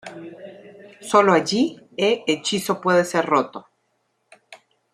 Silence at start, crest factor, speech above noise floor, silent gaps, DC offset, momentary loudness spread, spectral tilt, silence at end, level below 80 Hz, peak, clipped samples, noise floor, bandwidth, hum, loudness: 0.05 s; 20 dB; 50 dB; none; under 0.1%; 22 LU; -4 dB/octave; 0.4 s; -70 dBFS; -2 dBFS; under 0.1%; -70 dBFS; 15 kHz; none; -20 LUFS